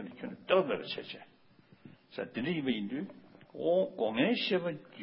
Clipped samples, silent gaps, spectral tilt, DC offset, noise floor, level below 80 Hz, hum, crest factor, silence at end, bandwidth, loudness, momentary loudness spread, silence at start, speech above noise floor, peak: under 0.1%; none; -3.5 dB/octave; under 0.1%; -62 dBFS; -76 dBFS; none; 22 dB; 0 s; 5.6 kHz; -33 LUFS; 17 LU; 0 s; 29 dB; -12 dBFS